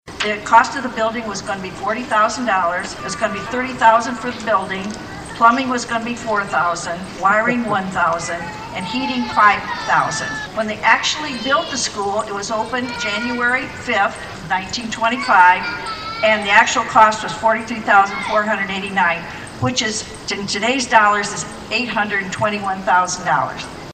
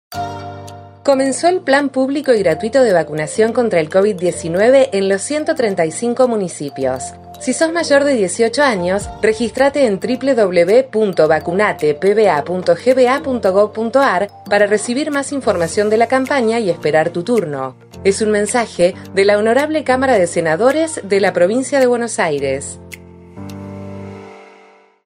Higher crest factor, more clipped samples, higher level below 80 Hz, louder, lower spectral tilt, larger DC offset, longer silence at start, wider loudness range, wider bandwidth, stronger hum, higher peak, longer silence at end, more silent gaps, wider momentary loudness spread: about the same, 18 dB vs 14 dB; neither; about the same, -48 dBFS vs -50 dBFS; about the same, -17 LUFS vs -15 LUFS; second, -3 dB/octave vs -4.5 dB/octave; neither; about the same, 0.05 s vs 0.1 s; about the same, 4 LU vs 2 LU; about the same, 14.5 kHz vs 15.5 kHz; neither; about the same, 0 dBFS vs 0 dBFS; second, 0 s vs 0.6 s; neither; about the same, 11 LU vs 12 LU